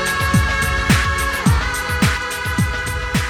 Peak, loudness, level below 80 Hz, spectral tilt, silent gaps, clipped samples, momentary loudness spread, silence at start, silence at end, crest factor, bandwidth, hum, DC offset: -2 dBFS; -18 LUFS; -24 dBFS; -4.5 dB/octave; none; under 0.1%; 5 LU; 0 s; 0 s; 16 dB; 16.5 kHz; none; under 0.1%